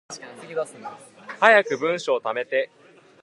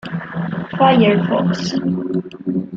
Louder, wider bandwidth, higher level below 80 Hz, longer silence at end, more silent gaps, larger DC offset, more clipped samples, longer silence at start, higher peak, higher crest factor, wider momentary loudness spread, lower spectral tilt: second, -22 LUFS vs -17 LUFS; first, 11.5 kHz vs 7.4 kHz; second, -80 dBFS vs -54 dBFS; first, 0.6 s vs 0 s; neither; neither; neither; about the same, 0.1 s vs 0.05 s; about the same, 0 dBFS vs -2 dBFS; first, 24 dB vs 16 dB; first, 23 LU vs 12 LU; second, -3 dB/octave vs -7 dB/octave